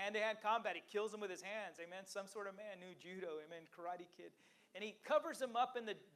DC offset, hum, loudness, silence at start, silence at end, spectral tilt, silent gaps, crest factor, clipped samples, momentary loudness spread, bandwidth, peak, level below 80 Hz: under 0.1%; none; -44 LUFS; 0 s; 0.05 s; -3 dB/octave; none; 20 dB; under 0.1%; 15 LU; 15.5 kHz; -24 dBFS; under -90 dBFS